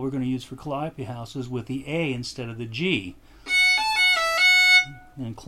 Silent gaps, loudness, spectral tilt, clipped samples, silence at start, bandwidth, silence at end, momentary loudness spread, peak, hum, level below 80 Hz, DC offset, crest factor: none; -20 LUFS; -3 dB/octave; under 0.1%; 0 s; 16 kHz; 0 s; 18 LU; -6 dBFS; none; -52 dBFS; under 0.1%; 18 dB